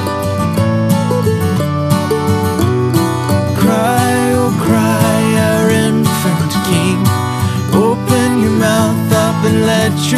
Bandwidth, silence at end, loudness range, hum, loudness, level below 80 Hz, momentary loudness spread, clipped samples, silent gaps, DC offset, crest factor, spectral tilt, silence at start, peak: 14 kHz; 0 s; 1 LU; none; -13 LUFS; -40 dBFS; 3 LU; under 0.1%; none; under 0.1%; 12 dB; -6 dB/octave; 0 s; 0 dBFS